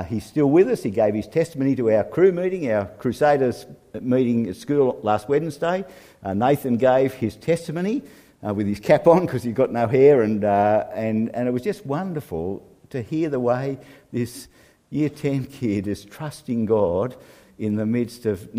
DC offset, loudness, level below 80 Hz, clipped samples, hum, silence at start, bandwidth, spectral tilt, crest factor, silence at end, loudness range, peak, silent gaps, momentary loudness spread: under 0.1%; -22 LUFS; -56 dBFS; under 0.1%; none; 0 s; 15.5 kHz; -7.5 dB/octave; 20 dB; 0 s; 7 LU; -2 dBFS; none; 13 LU